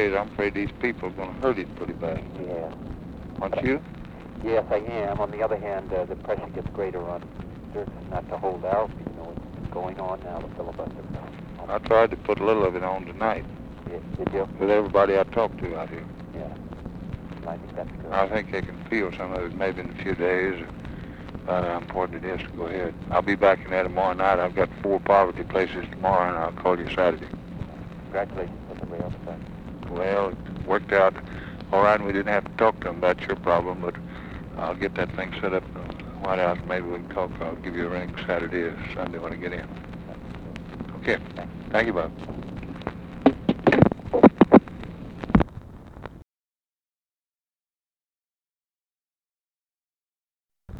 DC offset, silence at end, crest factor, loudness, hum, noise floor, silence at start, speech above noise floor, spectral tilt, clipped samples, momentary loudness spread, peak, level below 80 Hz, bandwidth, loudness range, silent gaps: under 0.1%; 0 s; 26 dB; -25 LUFS; none; under -90 dBFS; 0 s; over 64 dB; -8 dB/octave; under 0.1%; 17 LU; 0 dBFS; -44 dBFS; 9.2 kHz; 9 LU; 47.33-47.37 s, 47.76-47.80 s, 49.40-49.44 s, 49.62-49.66 s